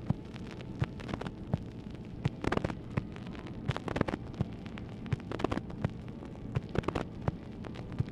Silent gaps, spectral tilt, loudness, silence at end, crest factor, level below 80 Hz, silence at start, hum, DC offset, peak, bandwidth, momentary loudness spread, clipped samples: none; -7.5 dB/octave; -38 LUFS; 0 s; 26 dB; -48 dBFS; 0 s; none; under 0.1%; -10 dBFS; 11.5 kHz; 9 LU; under 0.1%